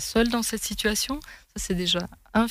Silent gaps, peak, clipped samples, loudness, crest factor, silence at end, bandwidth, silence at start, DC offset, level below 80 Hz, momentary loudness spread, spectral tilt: none; -10 dBFS; under 0.1%; -26 LUFS; 16 dB; 0 s; 16 kHz; 0 s; under 0.1%; -42 dBFS; 11 LU; -3 dB/octave